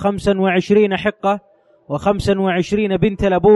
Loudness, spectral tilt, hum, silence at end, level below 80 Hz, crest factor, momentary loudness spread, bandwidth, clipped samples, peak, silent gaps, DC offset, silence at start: -17 LUFS; -7 dB/octave; none; 0 s; -38 dBFS; 14 dB; 6 LU; 11.5 kHz; under 0.1%; -2 dBFS; none; under 0.1%; 0 s